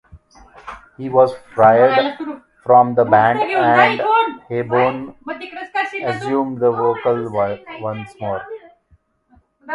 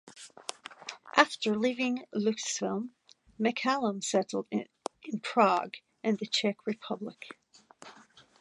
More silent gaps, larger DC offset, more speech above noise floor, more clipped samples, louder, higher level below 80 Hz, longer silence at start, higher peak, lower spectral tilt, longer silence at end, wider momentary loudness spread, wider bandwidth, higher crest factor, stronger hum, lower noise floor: neither; neither; first, 41 dB vs 28 dB; neither; first, -16 LUFS vs -30 LUFS; first, -56 dBFS vs -78 dBFS; about the same, 0.15 s vs 0.05 s; first, 0 dBFS vs -4 dBFS; first, -7 dB/octave vs -3.5 dB/octave; second, 0 s vs 0.4 s; about the same, 17 LU vs 18 LU; about the same, 11 kHz vs 11.5 kHz; second, 18 dB vs 28 dB; neither; about the same, -57 dBFS vs -58 dBFS